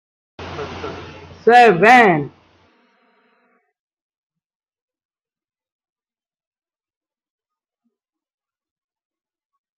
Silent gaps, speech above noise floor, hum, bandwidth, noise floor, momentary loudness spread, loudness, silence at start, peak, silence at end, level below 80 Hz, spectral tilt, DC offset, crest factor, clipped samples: none; over 78 dB; none; 12 kHz; under -90 dBFS; 23 LU; -11 LUFS; 0.4 s; 0 dBFS; 7.5 s; -62 dBFS; -5.5 dB/octave; under 0.1%; 20 dB; under 0.1%